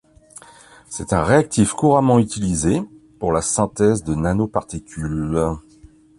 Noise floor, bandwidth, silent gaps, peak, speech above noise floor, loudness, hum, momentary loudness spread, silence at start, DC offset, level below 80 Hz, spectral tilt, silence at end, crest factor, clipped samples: -48 dBFS; 11.5 kHz; none; -2 dBFS; 30 dB; -19 LUFS; none; 13 LU; 0.9 s; under 0.1%; -38 dBFS; -6 dB/octave; 0.6 s; 16 dB; under 0.1%